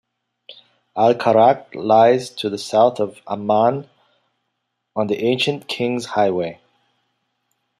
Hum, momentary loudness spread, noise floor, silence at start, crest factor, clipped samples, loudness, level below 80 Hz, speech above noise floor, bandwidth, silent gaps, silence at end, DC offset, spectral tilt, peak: none; 12 LU; -75 dBFS; 0.5 s; 18 dB; under 0.1%; -18 LUFS; -66 dBFS; 58 dB; 13 kHz; none; 1.25 s; under 0.1%; -5.5 dB/octave; -2 dBFS